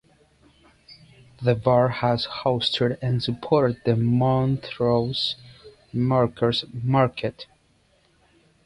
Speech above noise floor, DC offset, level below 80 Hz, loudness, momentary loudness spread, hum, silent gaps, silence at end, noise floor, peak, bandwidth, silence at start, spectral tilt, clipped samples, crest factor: 40 dB; under 0.1%; -54 dBFS; -23 LUFS; 7 LU; none; none; 1.2 s; -62 dBFS; -6 dBFS; 10.5 kHz; 0.9 s; -7.5 dB/octave; under 0.1%; 18 dB